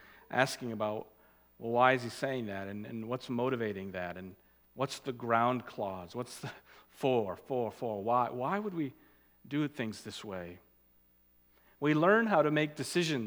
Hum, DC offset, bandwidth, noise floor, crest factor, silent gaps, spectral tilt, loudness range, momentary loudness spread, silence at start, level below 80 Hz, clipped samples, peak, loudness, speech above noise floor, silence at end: none; under 0.1%; over 20 kHz; -67 dBFS; 24 dB; none; -5.5 dB/octave; 5 LU; 15 LU; 0.1 s; -74 dBFS; under 0.1%; -10 dBFS; -33 LUFS; 34 dB; 0 s